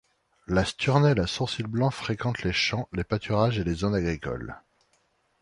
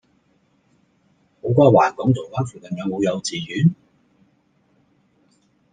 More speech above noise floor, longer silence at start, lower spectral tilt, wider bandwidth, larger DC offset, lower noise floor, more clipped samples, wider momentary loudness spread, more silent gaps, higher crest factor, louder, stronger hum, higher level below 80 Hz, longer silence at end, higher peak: about the same, 43 dB vs 44 dB; second, 0.5 s vs 1.45 s; about the same, -6 dB/octave vs -6.5 dB/octave; first, 11 kHz vs 9.6 kHz; neither; first, -69 dBFS vs -62 dBFS; neither; second, 10 LU vs 14 LU; neither; about the same, 20 dB vs 20 dB; second, -26 LUFS vs -20 LUFS; neither; first, -44 dBFS vs -58 dBFS; second, 0.85 s vs 2 s; second, -8 dBFS vs -2 dBFS